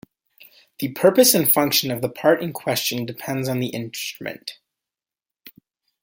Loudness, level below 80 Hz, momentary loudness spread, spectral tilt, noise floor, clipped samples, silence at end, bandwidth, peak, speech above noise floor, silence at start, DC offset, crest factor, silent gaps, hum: -20 LUFS; -64 dBFS; 16 LU; -3.5 dB/octave; -89 dBFS; under 0.1%; 0.55 s; 17 kHz; -2 dBFS; 69 dB; 0.8 s; under 0.1%; 20 dB; none; none